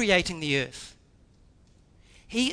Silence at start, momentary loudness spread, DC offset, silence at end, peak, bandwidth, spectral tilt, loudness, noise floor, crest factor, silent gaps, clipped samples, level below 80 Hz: 0 s; 20 LU; under 0.1%; 0 s; -6 dBFS; 11 kHz; -3.5 dB/octave; -27 LUFS; -58 dBFS; 22 dB; none; under 0.1%; -52 dBFS